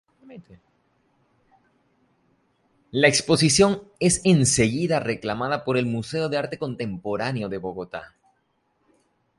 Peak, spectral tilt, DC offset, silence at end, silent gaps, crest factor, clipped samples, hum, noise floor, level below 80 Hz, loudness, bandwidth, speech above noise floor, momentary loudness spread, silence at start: -2 dBFS; -4 dB/octave; under 0.1%; 1.3 s; none; 22 dB; under 0.1%; none; -70 dBFS; -52 dBFS; -22 LUFS; 11.5 kHz; 47 dB; 13 LU; 0.25 s